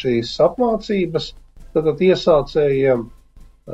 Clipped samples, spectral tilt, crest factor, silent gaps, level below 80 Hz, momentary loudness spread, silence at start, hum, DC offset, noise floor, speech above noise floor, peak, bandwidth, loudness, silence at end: under 0.1%; -7 dB/octave; 16 dB; none; -42 dBFS; 8 LU; 0 s; none; under 0.1%; -45 dBFS; 28 dB; -4 dBFS; 8.2 kHz; -18 LUFS; 0 s